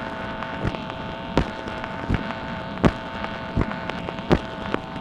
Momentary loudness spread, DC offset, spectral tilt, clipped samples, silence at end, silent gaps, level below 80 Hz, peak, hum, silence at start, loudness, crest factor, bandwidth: 8 LU; under 0.1%; -7 dB/octave; under 0.1%; 0 s; none; -36 dBFS; 0 dBFS; none; 0 s; -27 LUFS; 26 dB; 11 kHz